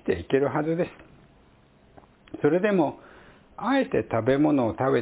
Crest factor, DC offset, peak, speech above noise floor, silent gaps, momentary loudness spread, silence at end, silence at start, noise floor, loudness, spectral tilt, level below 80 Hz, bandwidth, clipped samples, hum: 16 dB; under 0.1%; -10 dBFS; 34 dB; none; 10 LU; 0 s; 0.05 s; -57 dBFS; -25 LUFS; -11 dB/octave; -54 dBFS; 4 kHz; under 0.1%; none